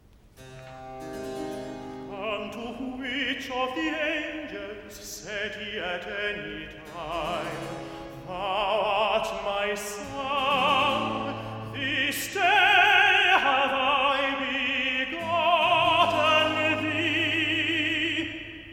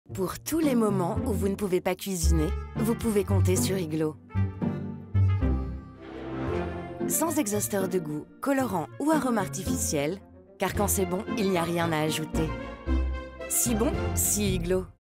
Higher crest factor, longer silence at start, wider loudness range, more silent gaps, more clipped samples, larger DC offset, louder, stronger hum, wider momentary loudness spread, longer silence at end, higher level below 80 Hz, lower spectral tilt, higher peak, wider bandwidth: first, 20 dB vs 14 dB; first, 0.4 s vs 0.1 s; first, 12 LU vs 2 LU; neither; neither; neither; first, -25 LUFS vs -28 LUFS; neither; first, 18 LU vs 8 LU; second, 0 s vs 0.15 s; second, -54 dBFS vs -38 dBFS; second, -3 dB/octave vs -5 dB/octave; first, -8 dBFS vs -14 dBFS; about the same, 17.5 kHz vs 16 kHz